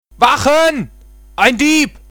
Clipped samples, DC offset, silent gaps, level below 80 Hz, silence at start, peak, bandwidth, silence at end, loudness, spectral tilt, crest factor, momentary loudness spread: under 0.1%; under 0.1%; none; -40 dBFS; 0.2 s; 0 dBFS; 19.5 kHz; 0.2 s; -12 LUFS; -3 dB/octave; 14 dB; 16 LU